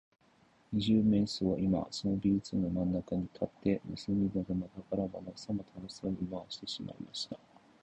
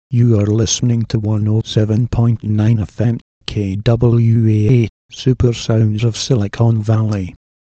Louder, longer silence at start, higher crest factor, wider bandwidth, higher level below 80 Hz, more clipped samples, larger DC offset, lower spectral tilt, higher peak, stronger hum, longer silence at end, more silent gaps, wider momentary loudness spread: second, -34 LUFS vs -15 LUFS; first, 0.7 s vs 0.1 s; about the same, 18 dB vs 14 dB; first, 10 kHz vs 8 kHz; second, -56 dBFS vs -36 dBFS; neither; neither; about the same, -7 dB/octave vs -6.5 dB/octave; second, -18 dBFS vs 0 dBFS; neither; about the same, 0.45 s vs 0.35 s; second, none vs 3.21-3.41 s, 4.89-5.09 s; first, 11 LU vs 7 LU